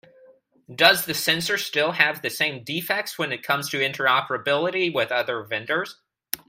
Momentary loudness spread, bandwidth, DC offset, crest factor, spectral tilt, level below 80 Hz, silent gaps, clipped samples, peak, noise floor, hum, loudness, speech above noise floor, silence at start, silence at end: 10 LU; 16 kHz; under 0.1%; 24 dB; -2.5 dB/octave; -68 dBFS; none; under 0.1%; 0 dBFS; -55 dBFS; none; -22 LUFS; 31 dB; 0.7 s; 0.15 s